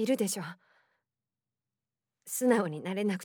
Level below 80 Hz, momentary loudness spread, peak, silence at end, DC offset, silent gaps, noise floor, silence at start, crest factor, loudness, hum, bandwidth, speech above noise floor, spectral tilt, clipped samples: under -90 dBFS; 10 LU; -12 dBFS; 0 s; under 0.1%; none; under -90 dBFS; 0 s; 22 dB; -31 LUFS; none; over 20 kHz; over 60 dB; -4.5 dB/octave; under 0.1%